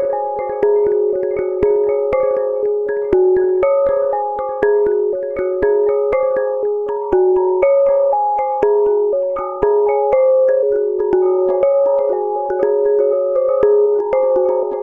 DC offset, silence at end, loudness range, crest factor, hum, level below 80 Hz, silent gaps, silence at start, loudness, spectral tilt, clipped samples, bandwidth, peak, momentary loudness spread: under 0.1%; 0 s; 1 LU; 14 dB; none; -46 dBFS; none; 0 s; -16 LUFS; -9.5 dB/octave; under 0.1%; 3.1 kHz; -2 dBFS; 6 LU